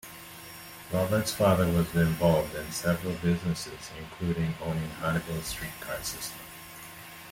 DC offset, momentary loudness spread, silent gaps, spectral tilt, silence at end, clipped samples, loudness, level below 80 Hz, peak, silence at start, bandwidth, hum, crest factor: under 0.1%; 18 LU; none; -5.5 dB/octave; 0 s; under 0.1%; -29 LUFS; -50 dBFS; -10 dBFS; 0.05 s; 17 kHz; none; 20 dB